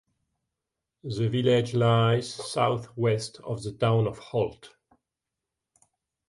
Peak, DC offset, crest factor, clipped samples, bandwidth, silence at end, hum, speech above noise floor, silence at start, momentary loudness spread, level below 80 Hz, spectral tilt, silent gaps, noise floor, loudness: -10 dBFS; under 0.1%; 16 dB; under 0.1%; 11.5 kHz; 1.65 s; none; 61 dB; 1.05 s; 12 LU; -60 dBFS; -6.5 dB/octave; none; -87 dBFS; -26 LUFS